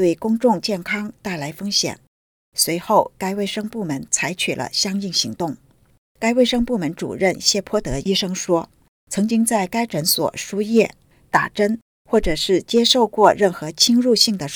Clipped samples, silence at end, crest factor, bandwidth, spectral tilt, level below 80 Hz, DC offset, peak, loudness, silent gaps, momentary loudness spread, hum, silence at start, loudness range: under 0.1%; 0 s; 20 dB; over 20 kHz; -3.5 dB/octave; -44 dBFS; under 0.1%; 0 dBFS; -19 LUFS; 2.07-2.52 s, 5.98-6.15 s, 8.88-9.07 s, 11.82-12.05 s; 11 LU; none; 0 s; 4 LU